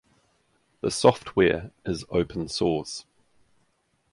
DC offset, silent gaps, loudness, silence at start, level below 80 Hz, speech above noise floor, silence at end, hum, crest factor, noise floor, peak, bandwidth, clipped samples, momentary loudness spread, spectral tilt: under 0.1%; none; -25 LUFS; 0.85 s; -50 dBFS; 45 dB; 1.1 s; none; 24 dB; -70 dBFS; -4 dBFS; 11.5 kHz; under 0.1%; 12 LU; -5 dB/octave